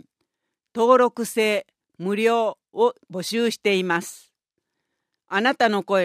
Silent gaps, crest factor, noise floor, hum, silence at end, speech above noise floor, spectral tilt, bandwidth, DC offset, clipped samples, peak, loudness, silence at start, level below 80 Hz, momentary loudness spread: none; 20 dB; -81 dBFS; none; 0 s; 60 dB; -4 dB/octave; 15.5 kHz; under 0.1%; under 0.1%; -4 dBFS; -22 LUFS; 0.75 s; -76 dBFS; 10 LU